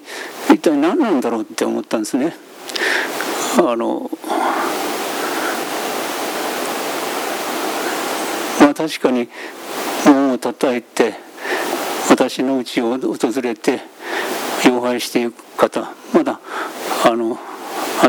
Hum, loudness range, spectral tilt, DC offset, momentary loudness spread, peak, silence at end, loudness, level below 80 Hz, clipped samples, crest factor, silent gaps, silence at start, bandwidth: none; 4 LU; -3.5 dB/octave; under 0.1%; 10 LU; 0 dBFS; 0 s; -18 LUFS; -68 dBFS; under 0.1%; 18 dB; none; 0 s; over 20 kHz